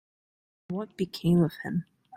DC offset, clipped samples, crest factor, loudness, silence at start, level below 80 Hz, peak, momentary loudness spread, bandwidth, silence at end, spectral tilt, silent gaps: under 0.1%; under 0.1%; 18 dB; -29 LUFS; 0.7 s; -60 dBFS; -12 dBFS; 12 LU; 14 kHz; 0.35 s; -8 dB/octave; none